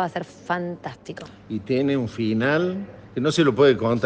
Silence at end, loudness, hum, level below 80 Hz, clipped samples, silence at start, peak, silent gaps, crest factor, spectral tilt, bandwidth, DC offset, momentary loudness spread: 0 s; -22 LUFS; none; -58 dBFS; under 0.1%; 0 s; -4 dBFS; none; 18 dB; -6.5 dB/octave; 9.4 kHz; under 0.1%; 17 LU